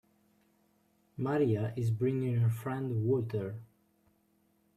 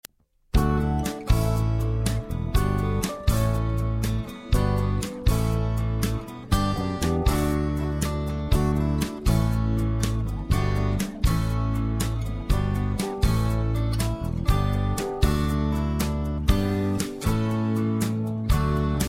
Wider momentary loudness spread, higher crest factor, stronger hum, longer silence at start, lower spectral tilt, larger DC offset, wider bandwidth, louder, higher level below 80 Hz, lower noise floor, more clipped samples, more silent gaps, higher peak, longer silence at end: first, 10 LU vs 4 LU; about the same, 16 dB vs 18 dB; neither; first, 1.2 s vs 0.55 s; first, -9 dB/octave vs -6.5 dB/octave; neither; second, 14 kHz vs 16.5 kHz; second, -32 LUFS vs -25 LUFS; second, -68 dBFS vs -28 dBFS; first, -72 dBFS vs -51 dBFS; neither; neither; second, -18 dBFS vs -6 dBFS; first, 1.1 s vs 0 s